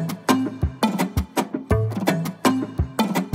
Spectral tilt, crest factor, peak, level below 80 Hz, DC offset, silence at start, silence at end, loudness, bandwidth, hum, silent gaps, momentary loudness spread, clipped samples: -5.5 dB/octave; 20 dB; -2 dBFS; -34 dBFS; under 0.1%; 0 s; 0 s; -23 LUFS; 16.5 kHz; none; none; 4 LU; under 0.1%